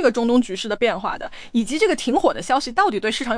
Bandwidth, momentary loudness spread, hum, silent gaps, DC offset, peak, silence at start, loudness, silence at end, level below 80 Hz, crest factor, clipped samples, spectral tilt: 10.5 kHz; 7 LU; none; none; under 0.1%; -4 dBFS; 0 s; -20 LUFS; 0 s; -46 dBFS; 16 dB; under 0.1%; -3.5 dB/octave